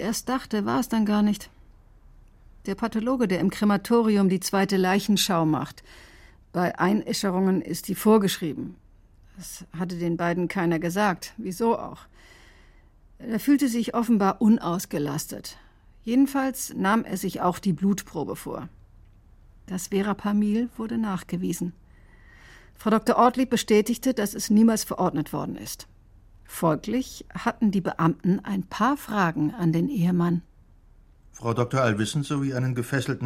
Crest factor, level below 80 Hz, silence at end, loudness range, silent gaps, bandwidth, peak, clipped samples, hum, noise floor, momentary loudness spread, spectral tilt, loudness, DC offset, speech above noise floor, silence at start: 18 dB; -54 dBFS; 0 s; 5 LU; none; 16.5 kHz; -6 dBFS; under 0.1%; none; -54 dBFS; 13 LU; -5.5 dB/octave; -25 LUFS; under 0.1%; 29 dB; 0 s